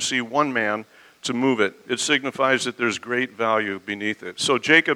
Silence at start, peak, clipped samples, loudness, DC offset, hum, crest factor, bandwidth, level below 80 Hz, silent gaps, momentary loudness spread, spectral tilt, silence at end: 0 s; 0 dBFS; under 0.1%; -22 LUFS; under 0.1%; none; 22 dB; 16 kHz; -70 dBFS; none; 7 LU; -3 dB/octave; 0 s